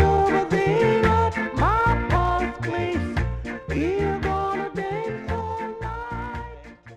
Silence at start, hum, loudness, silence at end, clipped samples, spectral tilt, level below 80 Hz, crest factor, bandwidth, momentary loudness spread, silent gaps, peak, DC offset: 0 s; none; -24 LUFS; 0 s; under 0.1%; -7 dB/octave; -34 dBFS; 16 dB; 12 kHz; 12 LU; none; -8 dBFS; under 0.1%